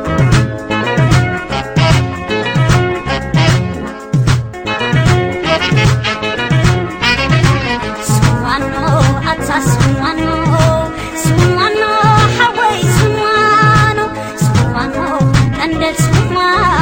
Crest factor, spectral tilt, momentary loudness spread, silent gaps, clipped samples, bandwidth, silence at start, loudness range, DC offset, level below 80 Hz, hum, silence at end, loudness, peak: 12 dB; -5.5 dB/octave; 7 LU; none; under 0.1%; 17 kHz; 0 s; 3 LU; under 0.1%; -28 dBFS; none; 0 s; -12 LUFS; 0 dBFS